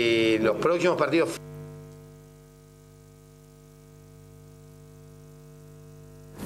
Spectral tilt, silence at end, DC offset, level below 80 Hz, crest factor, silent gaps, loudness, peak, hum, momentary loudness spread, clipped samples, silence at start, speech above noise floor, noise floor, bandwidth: -5 dB/octave; 0 s; under 0.1%; -58 dBFS; 20 dB; none; -24 LUFS; -10 dBFS; 50 Hz at -50 dBFS; 27 LU; under 0.1%; 0 s; 28 dB; -51 dBFS; 15.5 kHz